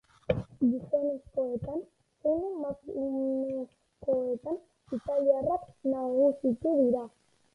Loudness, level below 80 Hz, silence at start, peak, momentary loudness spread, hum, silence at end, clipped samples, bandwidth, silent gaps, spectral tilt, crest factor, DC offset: -31 LUFS; -58 dBFS; 0.3 s; -12 dBFS; 12 LU; none; 0.45 s; under 0.1%; 4.8 kHz; none; -9.5 dB/octave; 20 dB; under 0.1%